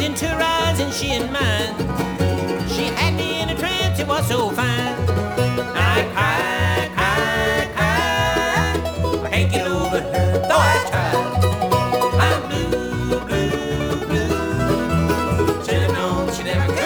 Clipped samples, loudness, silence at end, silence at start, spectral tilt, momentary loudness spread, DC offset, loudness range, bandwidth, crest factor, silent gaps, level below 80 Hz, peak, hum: under 0.1%; -19 LUFS; 0 s; 0 s; -5 dB/octave; 4 LU; under 0.1%; 2 LU; over 20 kHz; 16 dB; none; -34 dBFS; -2 dBFS; none